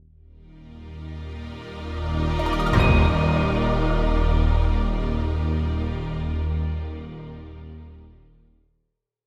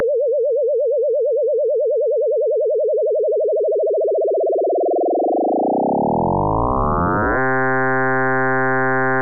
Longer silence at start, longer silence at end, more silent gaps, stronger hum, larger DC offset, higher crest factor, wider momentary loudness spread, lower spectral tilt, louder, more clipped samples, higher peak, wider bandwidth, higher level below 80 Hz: first, 0.55 s vs 0 s; first, 1.15 s vs 0 s; neither; neither; neither; first, 18 dB vs 6 dB; first, 20 LU vs 1 LU; second, -7.5 dB/octave vs -11.5 dB/octave; second, -23 LUFS vs -18 LUFS; neither; first, -6 dBFS vs -12 dBFS; first, 8 kHz vs 2.6 kHz; first, -26 dBFS vs -38 dBFS